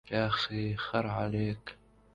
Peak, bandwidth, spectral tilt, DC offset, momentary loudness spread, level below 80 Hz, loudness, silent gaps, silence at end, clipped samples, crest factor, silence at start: -14 dBFS; 7.6 kHz; -7 dB/octave; under 0.1%; 8 LU; -56 dBFS; -33 LUFS; none; 0.4 s; under 0.1%; 18 dB; 0.05 s